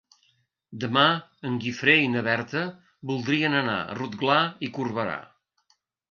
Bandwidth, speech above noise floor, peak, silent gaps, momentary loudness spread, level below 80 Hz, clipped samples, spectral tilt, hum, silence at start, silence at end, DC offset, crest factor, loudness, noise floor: 7 kHz; 45 dB; -6 dBFS; none; 13 LU; -66 dBFS; under 0.1%; -5.5 dB/octave; none; 0.7 s; 0.85 s; under 0.1%; 22 dB; -25 LUFS; -70 dBFS